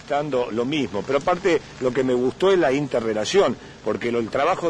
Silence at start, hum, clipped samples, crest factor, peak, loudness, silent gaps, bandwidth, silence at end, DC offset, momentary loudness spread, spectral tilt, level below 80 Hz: 0 s; none; under 0.1%; 16 dB; -6 dBFS; -22 LUFS; none; 10.5 kHz; 0 s; under 0.1%; 6 LU; -5 dB/octave; -52 dBFS